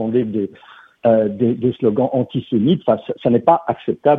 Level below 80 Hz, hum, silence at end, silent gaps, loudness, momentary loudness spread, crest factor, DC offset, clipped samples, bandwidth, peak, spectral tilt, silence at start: -56 dBFS; none; 0 s; none; -18 LUFS; 6 LU; 16 dB; under 0.1%; under 0.1%; 4 kHz; 0 dBFS; -10.5 dB/octave; 0 s